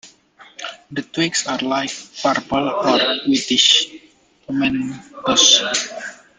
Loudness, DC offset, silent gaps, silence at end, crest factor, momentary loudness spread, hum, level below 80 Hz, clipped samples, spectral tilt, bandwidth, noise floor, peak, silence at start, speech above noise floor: -16 LUFS; under 0.1%; none; 0.25 s; 20 dB; 17 LU; none; -56 dBFS; under 0.1%; -1.5 dB/octave; 9.8 kHz; -53 dBFS; 0 dBFS; 0.05 s; 34 dB